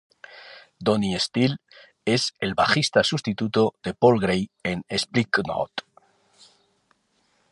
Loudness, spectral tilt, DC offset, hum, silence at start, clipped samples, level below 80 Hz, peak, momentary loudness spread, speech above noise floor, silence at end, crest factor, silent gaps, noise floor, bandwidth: -23 LUFS; -5 dB/octave; under 0.1%; none; 0.3 s; under 0.1%; -56 dBFS; -4 dBFS; 12 LU; 45 dB; 1.7 s; 20 dB; none; -68 dBFS; 11.5 kHz